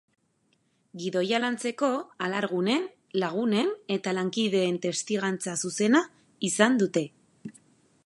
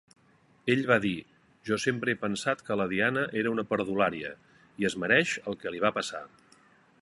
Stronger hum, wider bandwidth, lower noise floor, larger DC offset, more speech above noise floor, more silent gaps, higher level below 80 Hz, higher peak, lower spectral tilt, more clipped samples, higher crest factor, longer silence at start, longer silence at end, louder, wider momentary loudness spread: neither; about the same, 11.5 kHz vs 11.5 kHz; first, -70 dBFS vs -63 dBFS; neither; first, 44 dB vs 35 dB; neither; second, -78 dBFS vs -66 dBFS; about the same, -6 dBFS vs -6 dBFS; about the same, -4 dB/octave vs -5 dB/octave; neither; about the same, 22 dB vs 24 dB; first, 0.95 s vs 0.65 s; second, 0.55 s vs 0.75 s; about the same, -27 LUFS vs -29 LUFS; about the same, 14 LU vs 12 LU